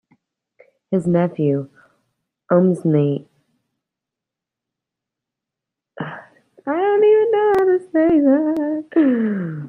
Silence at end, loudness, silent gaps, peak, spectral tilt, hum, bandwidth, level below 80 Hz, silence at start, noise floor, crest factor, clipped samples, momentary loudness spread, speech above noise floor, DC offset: 0 s; -17 LUFS; none; -2 dBFS; -9.5 dB/octave; none; 9.8 kHz; -60 dBFS; 0.9 s; -85 dBFS; 16 dB; under 0.1%; 17 LU; 68 dB; under 0.1%